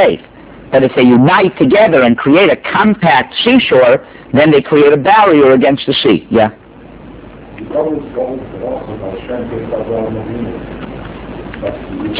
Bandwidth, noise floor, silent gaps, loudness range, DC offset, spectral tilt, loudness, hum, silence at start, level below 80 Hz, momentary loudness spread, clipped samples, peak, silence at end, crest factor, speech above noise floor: 4 kHz; -34 dBFS; none; 13 LU; under 0.1%; -10 dB/octave; -10 LUFS; none; 0 s; -40 dBFS; 16 LU; 0.5%; 0 dBFS; 0 s; 12 dB; 24 dB